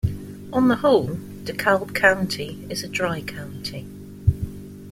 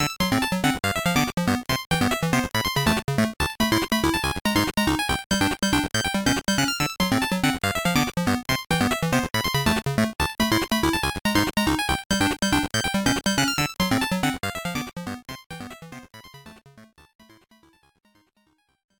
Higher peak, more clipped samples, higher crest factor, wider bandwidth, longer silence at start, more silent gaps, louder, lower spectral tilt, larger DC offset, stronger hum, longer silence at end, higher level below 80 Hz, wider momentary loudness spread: first, -2 dBFS vs -6 dBFS; neither; about the same, 20 dB vs 18 dB; second, 16.5 kHz vs over 20 kHz; about the same, 0.05 s vs 0 s; second, none vs 1.86-1.90 s, 4.41-4.45 s, 5.26-5.30 s, 12.06-12.10 s, 15.46-15.50 s; about the same, -23 LUFS vs -23 LUFS; first, -5.5 dB/octave vs -4 dB/octave; neither; neither; second, 0 s vs 2.15 s; about the same, -42 dBFS vs -42 dBFS; first, 15 LU vs 6 LU